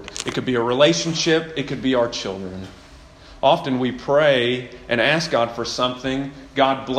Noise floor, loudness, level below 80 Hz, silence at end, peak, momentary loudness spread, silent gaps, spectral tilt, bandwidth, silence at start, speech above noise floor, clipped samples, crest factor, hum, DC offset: -44 dBFS; -20 LUFS; -50 dBFS; 0 s; -2 dBFS; 11 LU; none; -4 dB/octave; 12 kHz; 0 s; 24 dB; under 0.1%; 20 dB; none; under 0.1%